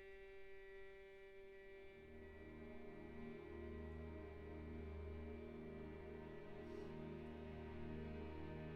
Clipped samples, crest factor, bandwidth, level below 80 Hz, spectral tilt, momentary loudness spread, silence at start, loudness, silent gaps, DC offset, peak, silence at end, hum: under 0.1%; 14 dB; 6.8 kHz; -60 dBFS; -7 dB/octave; 8 LU; 0 s; -55 LUFS; none; under 0.1%; -40 dBFS; 0 s; none